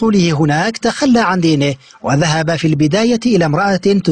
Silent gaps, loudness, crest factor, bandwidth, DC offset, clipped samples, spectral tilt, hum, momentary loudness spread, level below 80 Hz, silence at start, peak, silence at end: none; -14 LUFS; 10 dB; 10 kHz; 0.2%; under 0.1%; -5.5 dB/octave; none; 4 LU; -46 dBFS; 0 s; -2 dBFS; 0 s